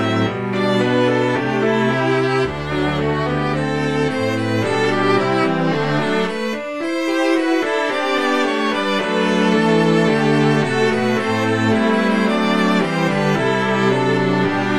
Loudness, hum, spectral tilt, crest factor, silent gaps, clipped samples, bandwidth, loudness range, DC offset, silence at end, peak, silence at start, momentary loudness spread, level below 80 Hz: -17 LUFS; none; -6 dB/octave; 14 dB; none; under 0.1%; 13 kHz; 2 LU; under 0.1%; 0 s; -4 dBFS; 0 s; 4 LU; -48 dBFS